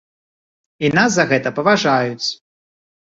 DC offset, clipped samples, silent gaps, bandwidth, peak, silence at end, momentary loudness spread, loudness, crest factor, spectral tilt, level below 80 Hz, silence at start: under 0.1%; under 0.1%; none; 8 kHz; -2 dBFS; 0.8 s; 9 LU; -16 LUFS; 18 dB; -4.5 dB/octave; -58 dBFS; 0.8 s